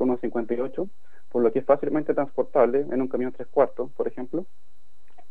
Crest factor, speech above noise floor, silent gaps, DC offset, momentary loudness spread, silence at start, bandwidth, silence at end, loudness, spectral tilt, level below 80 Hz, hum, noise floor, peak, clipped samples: 20 dB; 39 dB; none; 3%; 11 LU; 0 s; 4.6 kHz; 0.85 s; -25 LUFS; -10 dB/octave; -68 dBFS; none; -64 dBFS; -6 dBFS; under 0.1%